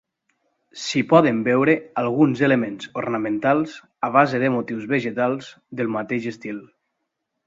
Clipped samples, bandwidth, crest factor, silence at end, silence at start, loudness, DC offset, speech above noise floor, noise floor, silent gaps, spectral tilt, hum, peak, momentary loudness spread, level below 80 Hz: under 0.1%; 7.8 kHz; 22 dB; 0.8 s; 0.75 s; -21 LUFS; under 0.1%; 57 dB; -78 dBFS; none; -6.5 dB/octave; none; 0 dBFS; 14 LU; -64 dBFS